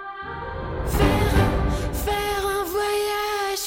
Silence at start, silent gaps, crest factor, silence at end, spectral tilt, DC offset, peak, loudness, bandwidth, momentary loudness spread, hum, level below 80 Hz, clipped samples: 0 s; none; 14 dB; 0 s; -5 dB/octave; under 0.1%; -8 dBFS; -24 LUFS; 17 kHz; 11 LU; none; -30 dBFS; under 0.1%